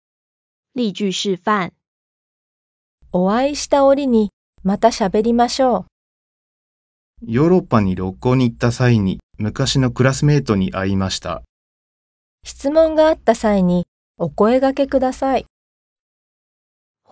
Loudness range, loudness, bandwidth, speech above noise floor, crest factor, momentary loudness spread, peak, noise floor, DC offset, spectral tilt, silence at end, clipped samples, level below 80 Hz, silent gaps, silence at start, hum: 3 LU; -17 LUFS; 8 kHz; over 74 dB; 18 dB; 11 LU; -2 dBFS; under -90 dBFS; under 0.1%; -6 dB/octave; 1.7 s; under 0.1%; -42 dBFS; 1.87-2.98 s, 4.33-4.53 s, 5.92-7.14 s, 9.23-9.29 s, 11.49-12.38 s, 13.88-14.14 s; 0.75 s; none